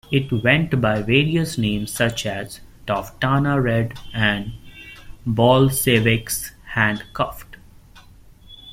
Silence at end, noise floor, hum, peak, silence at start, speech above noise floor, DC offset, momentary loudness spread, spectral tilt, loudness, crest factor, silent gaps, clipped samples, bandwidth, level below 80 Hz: 0 s; -46 dBFS; none; -2 dBFS; 0.1 s; 27 dB; under 0.1%; 17 LU; -5 dB/octave; -20 LUFS; 18 dB; none; under 0.1%; 16.5 kHz; -42 dBFS